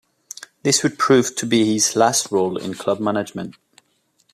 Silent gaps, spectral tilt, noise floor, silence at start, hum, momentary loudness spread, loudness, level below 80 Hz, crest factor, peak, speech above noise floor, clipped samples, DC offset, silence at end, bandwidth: none; -3.5 dB/octave; -64 dBFS; 0.65 s; none; 18 LU; -19 LUFS; -64 dBFS; 18 dB; -2 dBFS; 45 dB; under 0.1%; under 0.1%; 0.8 s; 15 kHz